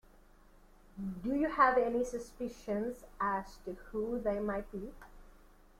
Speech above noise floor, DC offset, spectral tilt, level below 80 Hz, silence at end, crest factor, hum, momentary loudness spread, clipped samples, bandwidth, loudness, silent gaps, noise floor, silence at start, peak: 26 dB; under 0.1%; -6.5 dB/octave; -56 dBFS; 0.5 s; 24 dB; none; 18 LU; under 0.1%; 16 kHz; -35 LUFS; none; -61 dBFS; 0.95 s; -12 dBFS